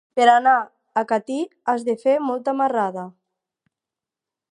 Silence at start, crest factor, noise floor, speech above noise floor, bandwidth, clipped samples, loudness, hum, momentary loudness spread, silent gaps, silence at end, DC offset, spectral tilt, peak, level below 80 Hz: 0.15 s; 20 dB; -88 dBFS; 68 dB; 10.5 kHz; under 0.1%; -20 LUFS; none; 11 LU; none; 1.4 s; under 0.1%; -4.5 dB/octave; -2 dBFS; -82 dBFS